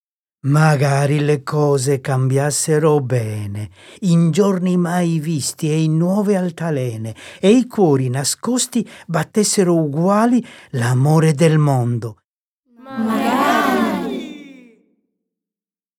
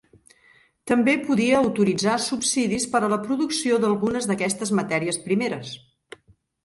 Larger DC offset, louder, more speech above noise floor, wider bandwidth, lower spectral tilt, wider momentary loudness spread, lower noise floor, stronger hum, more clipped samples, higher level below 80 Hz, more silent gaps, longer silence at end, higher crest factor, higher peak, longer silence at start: neither; first, -17 LUFS vs -22 LUFS; first, over 74 dB vs 37 dB; first, 16 kHz vs 12 kHz; first, -6 dB/octave vs -4 dB/octave; first, 11 LU vs 5 LU; first, under -90 dBFS vs -59 dBFS; neither; neither; about the same, -62 dBFS vs -60 dBFS; first, 12.25-12.63 s vs none; first, 1.45 s vs 0.85 s; about the same, 16 dB vs 16 dB; first, -2 dBFS vs -6 dBFS; second, 0.45 s vs 0.85 s